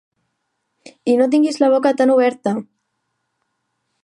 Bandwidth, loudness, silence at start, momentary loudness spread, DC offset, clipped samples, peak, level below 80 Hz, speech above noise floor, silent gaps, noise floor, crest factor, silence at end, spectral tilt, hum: 11.5 kHz; -16 LUFS; 1.05 s; 10 LU; under 0.1%; under 0.1%; -2 dBFS; -76 dBFS; 58 dB; none; -73 dBFS; 16 dB; 1.4 s; -5.5 dB/octave; none